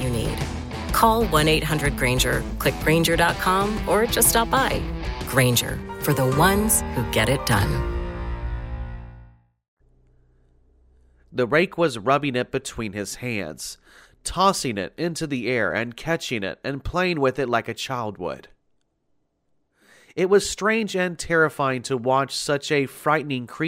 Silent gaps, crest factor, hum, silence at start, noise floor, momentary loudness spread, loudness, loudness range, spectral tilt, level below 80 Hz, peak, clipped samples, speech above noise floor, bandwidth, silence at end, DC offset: 9.68-9.77 s; 20 dB; none; 0 s; -70 dBFS; 12 LU; -22 LUFS; 8 LU; -4 dB/octave; -36 dBFS; -4 dBFS; under 0.1%; 48 dB; 16.5 kHz; 0 s; under 0.1%